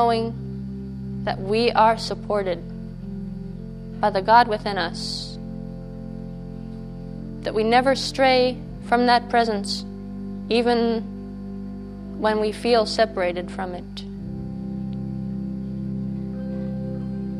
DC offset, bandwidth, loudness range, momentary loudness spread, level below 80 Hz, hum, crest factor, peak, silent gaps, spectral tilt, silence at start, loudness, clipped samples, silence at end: under 0.1%; 13.5 kHz; 8 LU; 17 LU; -42 dBFS; none; 22 dB; -2 dBFS; none; -5.5 dB/octave; 0 s; -23 LUFS; under 0.1%; 0 s